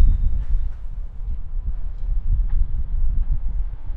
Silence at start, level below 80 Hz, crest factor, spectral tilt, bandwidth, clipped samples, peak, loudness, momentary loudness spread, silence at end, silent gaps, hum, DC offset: 0 s; -20 dBFS; 16 dB; -10 dB/octave; 1.4 kHz; under 0.1%; -4 dBFS; -28 LUFS; 8 LU; 0 s; none; none; under 0.1%